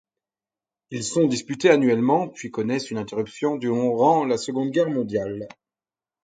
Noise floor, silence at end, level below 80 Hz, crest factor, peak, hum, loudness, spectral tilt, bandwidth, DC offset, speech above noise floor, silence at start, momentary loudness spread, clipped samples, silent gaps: under -90 dBFS; 0.8 s; -64 dBFS; 20 dB; -4 dBFS; none; -22 LUFS; -5.5 dB/octave; 9.4 kHz; under 0.1%; over 68 dB; 0.9 s; 12 LU; under 0.1%; none